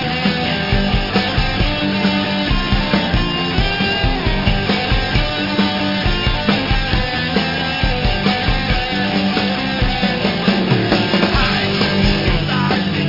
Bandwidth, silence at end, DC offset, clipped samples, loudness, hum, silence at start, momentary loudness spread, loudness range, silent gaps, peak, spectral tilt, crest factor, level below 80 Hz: 5.8 kHz; 0 s; 0.3%; under 0.1%; -16 LUFS; none; 0 s; 3 LU; 1 LU; none; -2 dBFS; -6.5 dB/octave; 16 dB; -24 dBFS